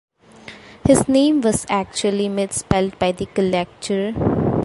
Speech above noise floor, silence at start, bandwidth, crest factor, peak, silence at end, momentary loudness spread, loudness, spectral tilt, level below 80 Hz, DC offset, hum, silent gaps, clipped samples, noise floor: 23 dB; 0.45 s; 11.5 kHz; 18 dB; 0 dBFS; 0 s; 8 LU; -19 LUFS; -5 dB/octave; -40 dBFS; under 0.1%; none; none; under 0.1%; -42 dBFS